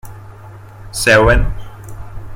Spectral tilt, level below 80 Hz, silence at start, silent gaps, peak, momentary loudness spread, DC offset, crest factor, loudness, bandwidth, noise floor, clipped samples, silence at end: -4.5 dB/octave; -24 dBFS; 0.05 s; none; 0 dBFS; 25 LU; under 0.1%; 16 dB; -12 LUFS; 16.5 kHz; -35 dBFS; under 0.1%; 0 s